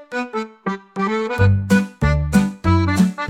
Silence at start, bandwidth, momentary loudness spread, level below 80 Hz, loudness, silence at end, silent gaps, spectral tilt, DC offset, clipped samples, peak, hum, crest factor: 0 s; 15 kHz; 10 LU; -32 dBFS; -19 LUFS; 0 s; none; -7 dB/octave; under 0.1%; under 0.1%; -2 dBFS; none; 16 dB